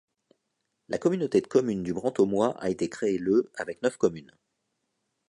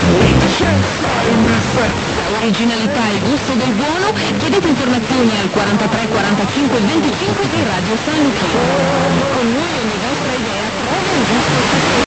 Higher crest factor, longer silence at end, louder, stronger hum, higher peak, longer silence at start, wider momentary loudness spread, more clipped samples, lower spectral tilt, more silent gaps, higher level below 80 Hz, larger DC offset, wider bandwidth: first, 20 dB vs 14 dB; first, 1.05 s vs 0 s; second, -27 LUFS vs -14 LUFS; neither; second, -8 dBFS vs 0 dBFS; first, 0.9 s vs 0 s; about the same, 6 LU vs 4 LU; neither; first, -6.5 dB/octave vs -5 dB/octave; neither; second, -64 dBFS vs -34 dBFS; second, under 0.1% vs 0.4%; first, 11 kHz vs 9 kHz